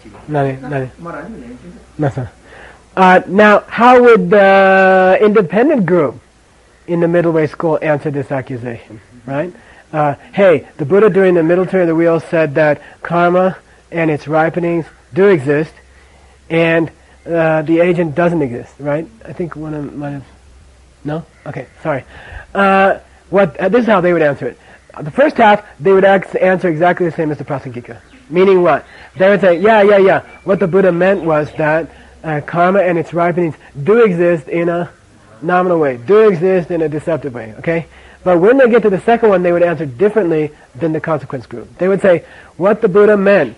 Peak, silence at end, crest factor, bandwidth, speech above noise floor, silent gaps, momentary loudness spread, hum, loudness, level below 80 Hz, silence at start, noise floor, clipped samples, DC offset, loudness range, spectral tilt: 0 dBFS; 0.05 s; 12 dB; 11 kHz; 35 dB; none; 16 LU; none; -13 LUFS; -48 dBFS; 0.05 s; -47 dBFS; under 0.1%; under 0.1%; 7 LU; -8 dB/octave